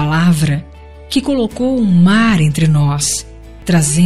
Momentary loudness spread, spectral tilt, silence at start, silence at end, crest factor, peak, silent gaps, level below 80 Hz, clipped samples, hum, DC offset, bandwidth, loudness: 9 LU; -5.5 dB/octave; 0 s; 0 s; 12 dB; 0 dBFS; none; -36 dBFS; under 0.1%; none; 2%; 15 kHz; -13 LUFS